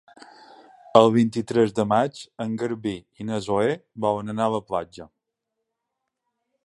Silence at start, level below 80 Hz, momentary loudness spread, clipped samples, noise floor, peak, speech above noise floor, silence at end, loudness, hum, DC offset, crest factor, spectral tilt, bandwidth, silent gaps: 0.95 s; -60 dBFS; 13 LU; under 0.1%; -82 dBFS; 0 dBFS; 59 dB; 1.6 s; -23 LUFS; none; under 0.1%; 24 dB; -6.5 dB/octave; 11.5 kHz; none